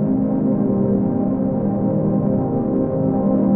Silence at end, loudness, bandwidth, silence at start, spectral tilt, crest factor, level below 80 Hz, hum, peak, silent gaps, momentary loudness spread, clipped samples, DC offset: 0 s; -19 LUFS; 2.4 kHz; 0 s; -15.5 dB/octave; 12 dB; -42 dBFS; none; -6 dBFS; none; 2 LU; under 0.1%; under 0.1%